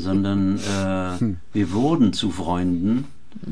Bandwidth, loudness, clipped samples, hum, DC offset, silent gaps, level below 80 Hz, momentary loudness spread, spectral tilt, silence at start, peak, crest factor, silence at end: 11 kHz; -22 LUFS; under 0.1%; none; 2%; none; -48 dBFS; 7 LU; -6.5 dB/octave; 0 s; -8 dBFS; 14 dB; 0 s